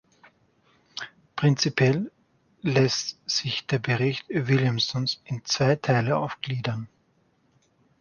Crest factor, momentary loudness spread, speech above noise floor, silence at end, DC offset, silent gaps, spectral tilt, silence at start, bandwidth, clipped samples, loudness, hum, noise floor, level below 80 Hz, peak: 18 dB; 15 LU; 42 dB; 1.15 s; under 0.1%; none; -5 dB/octave; 0.95 s; 7.2 kHz; under 0.1%; -25 LUFS; none; -66 dBFS; -62 dBFS; -8 dBFS